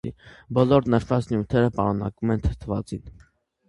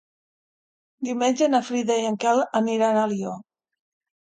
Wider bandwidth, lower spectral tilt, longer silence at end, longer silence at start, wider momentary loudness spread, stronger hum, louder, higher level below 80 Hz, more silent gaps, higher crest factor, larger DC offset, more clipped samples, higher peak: first, 11 kHz vs 9.4 kHz; first, -8.5 dB/octave vs -4.5 dB/octave; second, 0.6 s vs 0.85 s; second, 0.05 s vs 1 s; about the same, 12 LU vs 10 LU; neither; about the same, -23 LUFS vs -23 LUFS; first, -40 dBFS vs -74 dBFS; neither; about the same, 20 dB vs 18 dB; neither; neither; first, -4 dBFS vs -8 dBFS